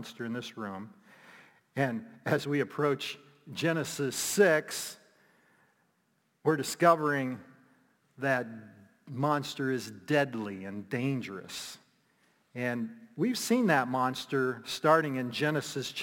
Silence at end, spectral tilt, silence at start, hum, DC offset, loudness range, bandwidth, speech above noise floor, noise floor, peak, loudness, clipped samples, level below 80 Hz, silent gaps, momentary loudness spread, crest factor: 0 s; -4.5 dB/octave; 0 s; none; under 0.1%; 5 LU; 17 kHz; 44 dB; -74 dBFS; -10 dBFS; -31 LUFS; under 0.1%; -78 dBFS; none; 16 LU; 22 dB